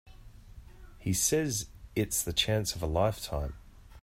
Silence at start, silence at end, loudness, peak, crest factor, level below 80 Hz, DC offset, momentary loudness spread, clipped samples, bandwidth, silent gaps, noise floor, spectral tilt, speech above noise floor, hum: 0.05 s; 0.05 s; -30 LUFS; -14 dBFS; 20 dB; -46 dBFS; under 0.1%; 11 LU; under 0.1%; 16 kHz; none; -50 dBFS; -3.5 dB/octave; 20 dB; none